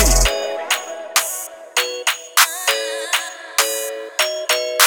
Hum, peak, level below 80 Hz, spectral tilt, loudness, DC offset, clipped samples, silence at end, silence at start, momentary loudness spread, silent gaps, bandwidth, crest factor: none; 0 dBFS; -28 dBFS; -0.5 dB/octave; -19 LUFS; under 0.1%; under 0.1%; 0 s; 0 s; 8 LU; none; over 20 kHz; 20 dB